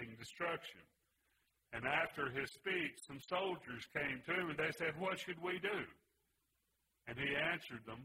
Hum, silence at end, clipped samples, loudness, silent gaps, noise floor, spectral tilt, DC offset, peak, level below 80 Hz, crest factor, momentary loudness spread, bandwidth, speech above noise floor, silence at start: none; 0 s; under 0.1%; -41 LUFS; none; -84 dBFS; -4.5 dB/octave; under 0.1%; -22 dBFS; -74 dBFS; 20 dB; 13 LU; 16 kHz; 41 dB; 0 s